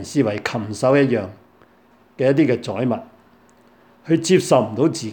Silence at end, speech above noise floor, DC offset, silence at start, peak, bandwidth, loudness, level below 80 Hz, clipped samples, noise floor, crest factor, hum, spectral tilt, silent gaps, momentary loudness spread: 0 s; 35 dB; under 0.1%; 0 s; -2 dBFS; 18 kHz; -19 LUFS; -62 dBFS; under 0.1%; -54 dBFS; 18 dB; none; -6 dB/octave; none; 9 LU